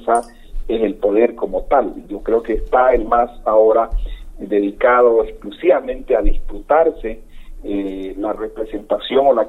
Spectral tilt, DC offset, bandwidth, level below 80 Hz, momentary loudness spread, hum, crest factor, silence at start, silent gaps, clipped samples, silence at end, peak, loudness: -6 dB/octave; under 0.1%; 10 kHz; -28 dBFS; 15 LU; none; 14 dB; 0 s; none; under 0.1%; 0 s; -2 dBFS; -17 LUFS